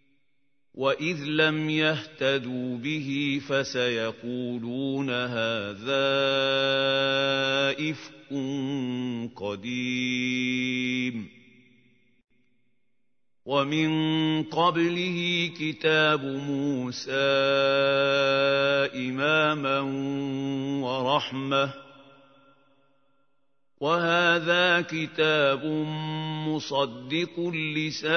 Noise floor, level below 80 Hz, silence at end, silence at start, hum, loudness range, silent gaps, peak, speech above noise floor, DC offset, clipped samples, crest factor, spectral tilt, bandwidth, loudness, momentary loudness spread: -82 dBFS; -72 dBFS; 0 s; 0.75 s; none; 6 LU; none; -8 dBFS; 56 dB; under 0.1%; under 0.1%; 20 dB; -5 dB/octave; 6.6 kHz; -26 LUFS; 9 LU